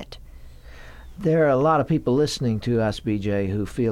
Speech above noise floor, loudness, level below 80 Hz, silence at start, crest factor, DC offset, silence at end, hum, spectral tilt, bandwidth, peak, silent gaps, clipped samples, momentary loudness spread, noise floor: 20 dB; -22 LUFS; -44 dBFS; 0 s; 14 dB; under 0.1%; 0 s; none; -7 dB/octave; 15 kHz; -8 dBFS; none; under 0.1%; 8 LU; -42 dBFS